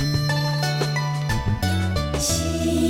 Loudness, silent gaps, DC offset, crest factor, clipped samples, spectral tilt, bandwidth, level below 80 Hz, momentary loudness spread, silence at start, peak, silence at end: -23 LUFS; none; under 0.1%; 12 dB; under 0.1%; -4.5 dB/octave; 17 kHz; -34 dBFS; 2 LU; 0 s; -10 dBFS; 0 s